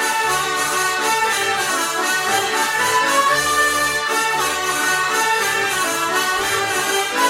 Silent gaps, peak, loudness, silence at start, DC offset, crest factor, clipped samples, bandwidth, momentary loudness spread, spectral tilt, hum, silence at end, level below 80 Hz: none; -4 dBFS; -17 LUFS; 0 s; under 0.1%; 14 dB; under 0.1%; 16.5 kHz; 3 LU; -0.5 dB/octave; none; 0 s; -52 dBFS